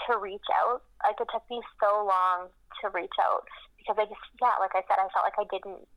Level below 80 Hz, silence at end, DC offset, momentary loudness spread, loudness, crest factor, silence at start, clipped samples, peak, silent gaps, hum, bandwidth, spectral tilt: -64 dBFS; 0.1 s; under 0.1%; 11 LU; -29 LUFS; 14 dB; 0 s; under 0.1%; -14 dBFS; none; none; 11 kHz; -3.5 dB/octave